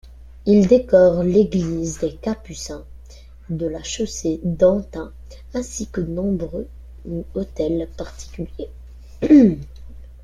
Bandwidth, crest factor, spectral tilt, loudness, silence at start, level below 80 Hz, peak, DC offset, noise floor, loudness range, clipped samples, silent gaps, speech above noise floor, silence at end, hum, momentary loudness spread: 12 kHz; 18 dB; -6.5 dB/octave; -19 LUFS; 0.05 s; -38 dBFS; -2 dBFS; under 0.1%; -41 dBFS; 8 LU; under 0.1%; none; 22 dB; 0.1 s; none; 20 LU